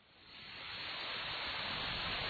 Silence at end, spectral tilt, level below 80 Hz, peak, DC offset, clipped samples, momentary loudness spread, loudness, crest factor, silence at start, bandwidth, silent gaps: 0 s; -4.5 dB/octave; -60 dBFS; -26 dBFS; under 0.1%; under 0.1%; 12 LU; -40 LUFS; 16 dB; 0.05 s; 4.8 kHz; none